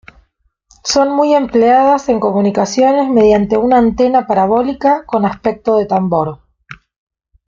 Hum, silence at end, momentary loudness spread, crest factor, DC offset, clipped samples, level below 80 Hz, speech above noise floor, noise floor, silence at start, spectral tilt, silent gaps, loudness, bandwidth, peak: none; 0.75 s; 6 LU; 12 dB; under 0.1%; under 0.1%; -44 dBFS; 48 dB; -60 dBFS; 0.85 s; -5.5 dB/octave; none; -12 LUFS; 7.6 kHz; -2 dBFS